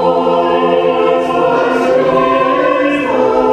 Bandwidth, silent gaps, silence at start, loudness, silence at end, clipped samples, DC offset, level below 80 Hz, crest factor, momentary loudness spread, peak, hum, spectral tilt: 9.4 kHz; none; 0 s; -12 LUFS; 0 s; under 0.1%; under 0.1%; -46 dBFS; 12 dB; 1 LU; 0 dBFS; none; -6 dB/octave